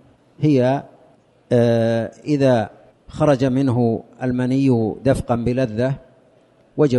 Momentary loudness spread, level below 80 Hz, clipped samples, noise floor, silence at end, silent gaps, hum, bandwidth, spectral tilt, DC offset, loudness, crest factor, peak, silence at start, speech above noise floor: 8 LU; -46 dBFS; under 0.1%; -54 dBFS; 0 s; none; none; 11.5 kHz; -8 dB/octave; under 0.1%; -19 LUFS; 14 dB; -4 dBFS; 0.4 s; 36 dB